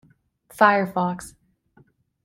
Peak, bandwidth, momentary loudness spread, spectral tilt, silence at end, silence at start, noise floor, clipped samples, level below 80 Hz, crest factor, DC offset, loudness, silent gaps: -2 dBFS; 16.5 kHz; 18 LU; -5.5 dB/octave; 0.95 s; 0.55 s; -59 dBFS; under 0.1%; -62 dBFS; 22 dB; under 0.1%; -20 LUFS; none